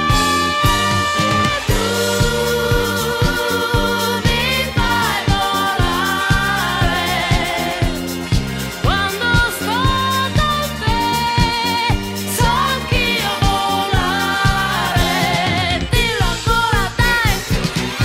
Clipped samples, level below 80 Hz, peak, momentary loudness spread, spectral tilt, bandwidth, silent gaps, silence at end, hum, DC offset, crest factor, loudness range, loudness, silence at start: under 0.1%; -26 dBFS; -4 dBFS; 4 LU; -4 dB/octave; 16 kHz; none; 0 s; none; under 0.1%; 14 dB; 1 LU; -16 LUFS; 0 s